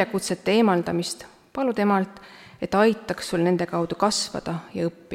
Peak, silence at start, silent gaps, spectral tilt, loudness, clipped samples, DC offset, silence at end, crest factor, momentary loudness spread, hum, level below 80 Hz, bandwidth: -6 dBFS; 0 s; none; -5 dB/octave; -24 LUFS; under 0.1%; under 0.1%; 0 s; 18 dB; 12 LU; none; -58 dBFS; 16 kHz